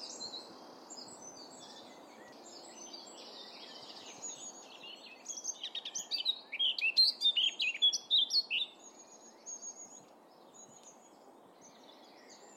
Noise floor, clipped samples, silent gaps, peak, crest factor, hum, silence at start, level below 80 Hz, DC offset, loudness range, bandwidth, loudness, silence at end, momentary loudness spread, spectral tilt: -59 dBFS; under 0.1%; none; -18 dBFS; 20 dB; none; 0 s; under -90 dBFS; under 0.1%; 20 LU; 16.5 kHz; -31 LUFS; 0 s; 26 LU; 2 dB/octave